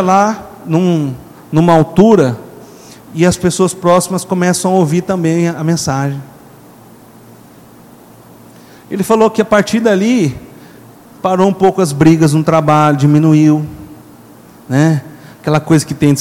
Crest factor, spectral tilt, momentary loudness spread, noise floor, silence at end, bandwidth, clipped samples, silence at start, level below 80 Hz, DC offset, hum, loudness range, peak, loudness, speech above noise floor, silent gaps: 12 dB; -6.5 dB/octave; 11 LU; -39 dBFS; 0 s; 16.5 kHz; 0.4%; 0 s; -46 dBFS; under 0.1%; none; 8 LU; 0 dBFS; -12 LUFS; 28 dB; none